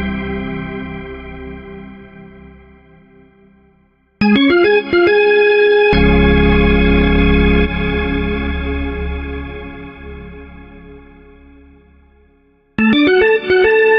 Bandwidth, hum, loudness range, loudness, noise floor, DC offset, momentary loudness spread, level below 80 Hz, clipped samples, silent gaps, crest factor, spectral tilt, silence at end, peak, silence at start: 5.6 kHz; none; 20 LU; -13 LUFS; -55 dBFS; under 0.1%; 21 LU; -24 dBFS; under 0.1%; none; 14 dB; -8.5 dB/octave; 0 s; -2 dBFS; 0 s